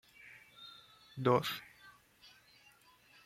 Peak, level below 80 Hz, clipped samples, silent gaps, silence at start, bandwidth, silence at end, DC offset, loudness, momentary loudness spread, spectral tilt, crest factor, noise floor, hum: -16 dBFS; -78 dBFS; under 0.1%; none; 0.25 s; 16 kHz; 1.35 s; under 0.1%; -34 LUFS; 28 LU; -6 dB/octave; 24 dB; -65 dBFS; none